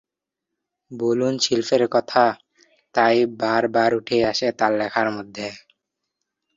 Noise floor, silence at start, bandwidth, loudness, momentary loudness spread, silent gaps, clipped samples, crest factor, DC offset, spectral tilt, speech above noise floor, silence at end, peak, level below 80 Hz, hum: -84 dBFS; 0.9 s; 7.8 kHz; -20 LUFS; 13 LU; none; under 0.1%; 20 dB; under 0.1%; -4 dB/octave; 64 dB; 1 s; -2 dBFS; -62 dBFS; none